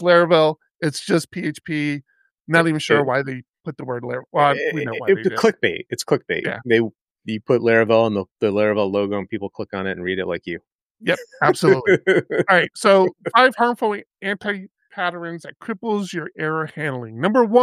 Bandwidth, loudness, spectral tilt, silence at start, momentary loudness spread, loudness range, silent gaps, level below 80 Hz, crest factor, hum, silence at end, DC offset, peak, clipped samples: 14.5 kHz; -20 LUFS; -5.5 dB/octave; 0 s; 13 LU; 6 LU; 0.71-0.75 s, 2.40-2.45 s, 3.49-3.53 s, 7.01-7.05 s, 8.31-8.35 s, 10.72-10.95 s, 14.06-14.10 s; -66 dBFS; 18 dB; none; 0 s; under 0.1%; -2 dBFS; under 0.1%